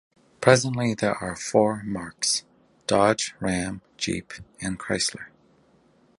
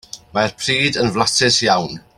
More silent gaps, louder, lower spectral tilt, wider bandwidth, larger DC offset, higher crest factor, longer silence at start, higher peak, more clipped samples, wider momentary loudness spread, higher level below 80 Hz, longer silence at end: neither; second, -25 LUFS vs -16 LUFS; about the same, -4 dB/octave vs -3 dB/octave; second, 11.5 kHz vs 15.5 kHz; neither; first, 24 dB vs 18 dB; first, 0.4 s vs 0.15 s; about the same, 0 dBFS vs 0 dBFS; neither; first, 14 LU vs 7 LU; second, -54 dBFS vs -48 dBFS; first, 0.9 s vs 0.2 s